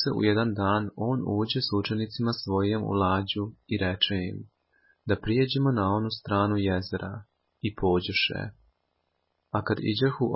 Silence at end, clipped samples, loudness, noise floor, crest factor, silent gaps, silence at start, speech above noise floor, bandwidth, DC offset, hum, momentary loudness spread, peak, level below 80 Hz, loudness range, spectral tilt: 0 s; under 0.1%; -27 LUFS; -76 dBFS; 20 dB; none; 0 s; 50 dB; 5.8 kHz; under 0.1%; none; 10 LU; -8 dBFS; -48 dBFS; 2 LU; -10 dB/octave